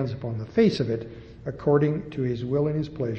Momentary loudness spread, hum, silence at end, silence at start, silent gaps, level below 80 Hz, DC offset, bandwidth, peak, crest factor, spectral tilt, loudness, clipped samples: 12 LU; none; 0 s; 0 s; none; -52 dBFS; under 0.1%; 8.4 kHz; -8 dBFS; 16 dB; -8.5 dB/octave; -25 LUFS; under 0.1%